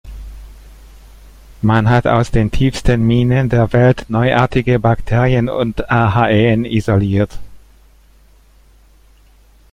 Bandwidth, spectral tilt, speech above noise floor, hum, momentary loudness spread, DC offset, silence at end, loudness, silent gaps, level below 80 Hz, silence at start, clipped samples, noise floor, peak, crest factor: 10 kHz; -7.5 dB/octave; 34 dB; none; 6 LU; under 0.1%; 2.15 s; -14 LUFS; none; -30 dBFS; 0.05 s; under 0.1%; -47 dBFS; 0 dBFS; 14 dB